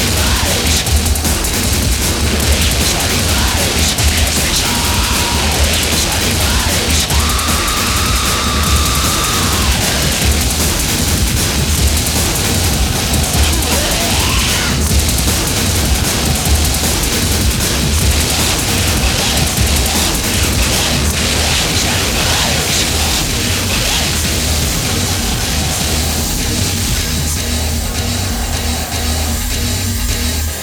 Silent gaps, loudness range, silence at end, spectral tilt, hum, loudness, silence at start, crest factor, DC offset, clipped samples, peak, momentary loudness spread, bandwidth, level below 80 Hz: none; 3 LU; 0 s; -3 dB/octave; none; -13 LUFS; 0 s; 14 dB; under 0.1%; under 0.1%; 0 dBFS; 4 LU; over 20 kHz; -20 dBFS